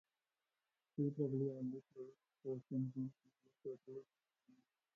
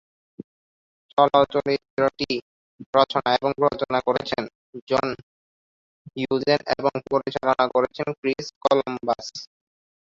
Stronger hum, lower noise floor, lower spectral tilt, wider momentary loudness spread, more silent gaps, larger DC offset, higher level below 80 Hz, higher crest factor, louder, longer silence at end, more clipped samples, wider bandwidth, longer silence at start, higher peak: neither; about the same, under -90 dBFS vs under -90 dBFS; first, -13.5 dB/octave vs -5.5 dB/octave; first, 16 LU vs 10 LU; second, none vs 1.90-1.97 s, 2.42-2.79 s, 2.86-2.93 s, 4.55-4.73 s, 4.82-4.87 s, 5.23-6.05 s, 8.18-8.23 s, 8.56-8.61 s; neither; second, -86 dBFS vs -60 dBFS; about the same, 20 dB vs 22 dB; second, -45 LUFS vs -23 LUFS; first, 0.9 s vs 0.65 s; neither; second, 6.4 kHz vs 7.6 kHz; second, 0.95 s vs 1.15 s; second, -28 dBFS vs -2 dBFS